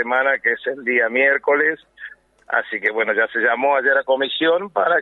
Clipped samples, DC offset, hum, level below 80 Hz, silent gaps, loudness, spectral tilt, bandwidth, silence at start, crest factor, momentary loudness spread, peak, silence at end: under 0.1%; under 0.1%; none; -68 dBFS; none; -18 LUFS; -5.5 dB/octave; 4.1 kHz; 0 s; 16 dB; 7 LU; -4 dBFS; 0 s